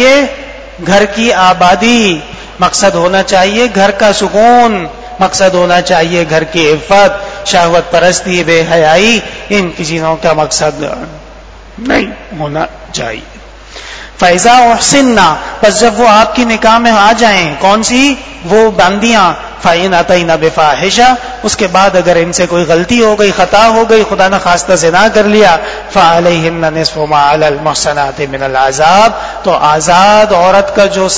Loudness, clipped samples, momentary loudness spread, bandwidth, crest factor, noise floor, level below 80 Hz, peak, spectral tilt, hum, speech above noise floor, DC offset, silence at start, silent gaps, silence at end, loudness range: -8 LUFS; 2%; 10 LU; 8 kHz; 8 dB; -31 dBFS; -34 dBFS; 0 dBFS; -3.5 dB/octave; none; 23 dB; 2%; 0 s; none; 0 s; 4 LU